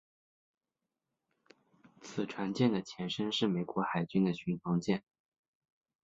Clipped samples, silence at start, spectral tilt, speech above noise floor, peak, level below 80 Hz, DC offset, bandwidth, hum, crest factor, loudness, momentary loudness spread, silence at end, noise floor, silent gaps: under 0.1%; 2 s; -6.5 dB/octave; 57 dB; -16 dBFS; -72 dBFS; under 0.1%; 7.8 kHz; none; 20 dB; -34 LUFS; 8 LU; 1.05 s; -90 dBFS; none